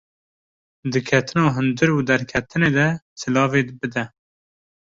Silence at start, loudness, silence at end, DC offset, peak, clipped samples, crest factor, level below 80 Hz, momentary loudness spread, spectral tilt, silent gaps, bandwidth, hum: 0.85 s; -20 LUFS; 0.8 s; under 0.1%; -2 dBFS; under 0.1%; 18 dB; -52 dBFS; 9 LU; -6 dB/octave; 3.02-3.16 s; 7.8 kHz; none